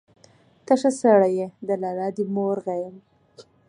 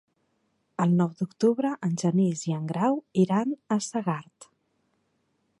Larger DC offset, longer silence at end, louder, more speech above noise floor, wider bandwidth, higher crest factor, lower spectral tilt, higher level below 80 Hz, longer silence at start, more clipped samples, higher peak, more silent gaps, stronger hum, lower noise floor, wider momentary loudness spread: neither; second, 0.25 s vs 1.15 s; first, -22 LUFS vs -26 LUFS; second, 34 dB vs 47 dB; about the same, 11 kHz vs 11 kHz; about the same, 18 dB vs 16 dB; about the same, -6.5 dB/octave vs -7 dB/octave; about the same, -74 dBFS vs -74 dBFS; about the same, 0.7 s vs 0.8 s; neither; first, -4 dBFS vs -10 dBFS; neither; neither; second, -56 dBFS vs -73 dBFS; first, 12 LU vs 6 LU